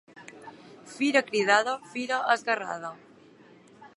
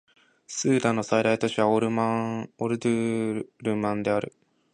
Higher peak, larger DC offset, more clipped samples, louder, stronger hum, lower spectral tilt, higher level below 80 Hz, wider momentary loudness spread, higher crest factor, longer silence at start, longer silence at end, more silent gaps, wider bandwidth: about the same, -8 dBFS vs -8 dBFS; neither; neither; about the same, -26 LUFS vs -26 LUFS; neither; second, -3 dB/octave vs -5.5 dB/octave; second, -82 dBFS vs -64 dBFS; first, 24 LU vs 8 LU; about the same, 22 dB vs 18 dB; second, 0.15 s vs 0.5 s; second, 0.1 s vs 0.45 s; neither; first, 11.5 kHz vs 10 kHz